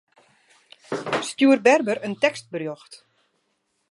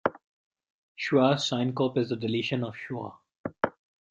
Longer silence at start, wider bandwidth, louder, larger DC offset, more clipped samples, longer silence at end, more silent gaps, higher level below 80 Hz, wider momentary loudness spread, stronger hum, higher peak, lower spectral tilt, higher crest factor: first, 0.9 s vs 0.05 s; first, 11.5 kHz vs 8.6 kHz; first, -22 LUFS vs -28 LUFS; neither; neither; first, 0.95 s vs 0.4 s; second, none vs 0.24-0.51 s, 0.70-0.95 s, 3.38-3.44 s; about the same, -74 dBFS vs -70 dBFS; about the same, 16 LU vs 14 LU; neither; first, -2 dBFS vs -8 dBFS; second, -4 dB/octave vs -5.5 dB/octave; about the same, 22 dB vs 22 dB